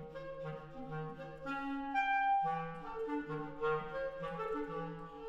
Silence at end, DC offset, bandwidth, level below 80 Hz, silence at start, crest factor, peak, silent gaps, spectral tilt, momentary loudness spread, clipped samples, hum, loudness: 0 s; under 0.1%; 7.8 kHz; -62 dBFS; 0 s; 16 dB; -24 dBFS; none; -7 dB/octave; 13 LU; under 0.1%; none; -39 LUFS